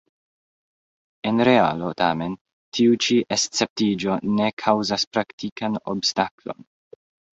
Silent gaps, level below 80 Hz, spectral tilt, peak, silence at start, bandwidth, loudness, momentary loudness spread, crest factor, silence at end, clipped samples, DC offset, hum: 2.41-2.45 s, 2.53-2.72 s, 3.70-3.76 s, 4.53-4.57 s, 5.07-5.11 s, 5.33-5.38 s, 5.52-5.56 s, 6.31-6.38 s; -60 dBFS; -4 dB/octave; -4 dBFS; 1.25 s; 8.2 kHz; -22 LUFS; 13 LU; 20 dB; 0.85 s; under 0.1%; under 0.1%; none